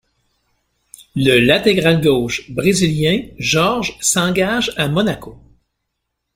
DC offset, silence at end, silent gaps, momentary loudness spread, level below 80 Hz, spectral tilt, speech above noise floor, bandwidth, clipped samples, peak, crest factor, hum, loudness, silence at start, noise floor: under 0.1%; 1 s; none; 6 LU; -44 dBFS; -4 dB/octave; 59 dB; 16 kHz; under 0.1%; -2 dBFS; 16 dB; none; -15 LUFS; 1.15 s; -75 dBFS